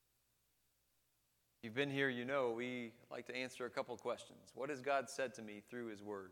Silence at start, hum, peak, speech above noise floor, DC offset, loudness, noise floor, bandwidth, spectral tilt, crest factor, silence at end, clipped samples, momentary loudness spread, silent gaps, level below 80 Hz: 1.65 s; none; -24 dBFS; 38 dB; under 0.1%; -43 LUFS; -81 dBFS; 18.5 kHz; -4.5 dB/octave; 22 dB; 0 s; under 0.1%; 12 LU; none; -88 dBFS